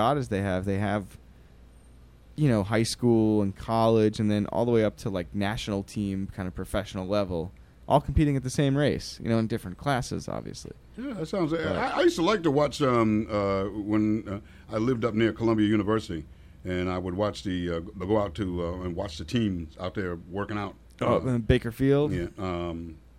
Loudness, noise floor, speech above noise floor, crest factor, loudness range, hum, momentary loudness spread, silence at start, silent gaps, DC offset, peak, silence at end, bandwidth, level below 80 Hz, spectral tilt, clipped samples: -27 LUFS; -52 dBFS; 26 dB; 20 dB; 5 LU; none; 11 LU; 0 s; none; under 0.1%; -8 dBFS; 0.2 s; 15 kHz; -44 dBFS; -6.5 dB/octave; under 0.1%